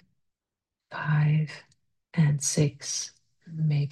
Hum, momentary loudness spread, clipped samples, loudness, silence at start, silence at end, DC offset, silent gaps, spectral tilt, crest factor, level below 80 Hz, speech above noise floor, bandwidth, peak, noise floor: none; 16 LU; under 0.1%; -27 LUFS; 0.9 s; 0 s; under 0.1%; none; -5 dB/octave; 18 dB; -68 dBFS; 63 dB; 12.5 kHz; -10 dBFS; -89 dBFS